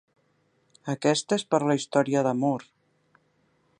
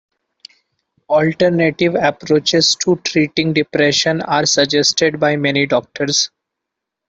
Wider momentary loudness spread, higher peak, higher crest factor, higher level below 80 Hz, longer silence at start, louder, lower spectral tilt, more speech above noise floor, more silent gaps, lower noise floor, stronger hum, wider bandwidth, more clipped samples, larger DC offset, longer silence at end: first, 10 LU vs 4 LU; second, -6 dBFS vs -2 dBFS; first, 22 dB vs 14 dB; second, -76 dBFS vs -56 dBFS; second, 0.85 s vs 1.1 s; second, -26 LUFS vs -15 LUFS; first, -5 dB/octave vs -3.5 dB/octave; second, 44 dB vs 65 dB; neither; second, -69 dBFS vs -80 dBFS; neither; first, 11 kHz vs 8.4 kHz; neither; neither; first, 1.15 s vs 0.8 s